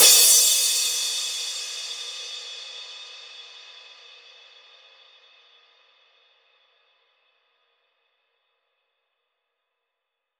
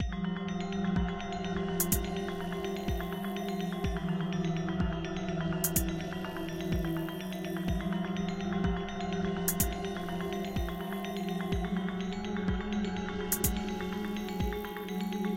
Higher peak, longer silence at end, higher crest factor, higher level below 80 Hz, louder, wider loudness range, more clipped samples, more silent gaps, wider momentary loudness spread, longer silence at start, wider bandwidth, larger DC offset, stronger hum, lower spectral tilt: first, -2 dBFS vs -12 dBFS; first, 6.7 s vs 0 s; about the same, 24 dB vs 22 dB; second, -84 dBFS vs -42 dBFS; first, -19 LUFS vs -34 LUFS; first, 28 LU vs 1 LU; neither; neither; first, 28 LU vs 6 LU; about the same, 0 s vs 0 s; first, over 20 kHz vs 17 kHz; neither; neither; second, 4 dB/octave vs -5 dB/octave